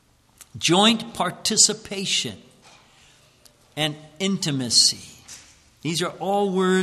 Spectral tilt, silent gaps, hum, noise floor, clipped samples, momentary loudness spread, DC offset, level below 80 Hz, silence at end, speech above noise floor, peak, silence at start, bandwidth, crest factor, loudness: -2.5 dB/octave; none; none; -55 dBFS; under 0.1%; 17 LU; under 0.1%; -62 dBFS; 0 s; 34 dB; -2 dBFS; 0.4 s; 14 kHz; 22 dB; -21 LUFS